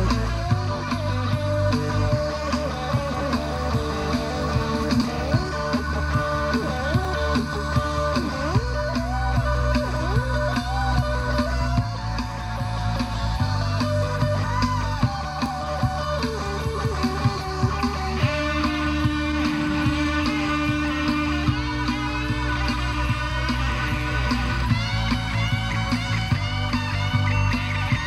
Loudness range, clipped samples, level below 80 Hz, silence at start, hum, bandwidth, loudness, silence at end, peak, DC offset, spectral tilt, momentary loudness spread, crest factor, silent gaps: 2 LU; under 0.1%; -30 dBFS; 0 s; none; 13.5 kHz; -24 LUFS; 0 s; -6 dBFS; under 0.1%; -6 dB/octave; 3 LU; 16 dB; none